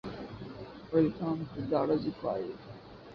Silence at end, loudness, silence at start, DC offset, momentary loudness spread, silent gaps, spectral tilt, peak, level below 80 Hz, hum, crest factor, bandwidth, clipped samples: 0 s; -33 LUFS; 0.05 s; under 0.1%; 17 LU; none; -9.5 dB/octave; -16 dBFS; -60 dBFS; none; 18 dB; 6.2 kHz; under 0.1%